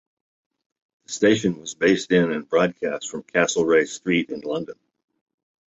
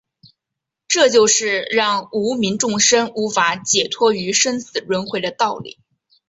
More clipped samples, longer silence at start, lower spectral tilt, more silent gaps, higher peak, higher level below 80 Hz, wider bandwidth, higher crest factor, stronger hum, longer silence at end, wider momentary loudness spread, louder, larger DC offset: neither; first, 1.1 s vs 0.9 s; first, -4.5 dB/octave vs -2 dB/octave; neither; second, -6 dBFS vs -2 dBFS; about the same, -62 dBFS vs -62 dBFS; about the same, 8.2 kHz vs 8.4 kHz; about the same, 18 dB vs 16 dB; neither; first, 0.95 s vs 0.6 s; about the same, 10 LU vs 9 LU; second, -22 LUFS vs -17 LUFS; neither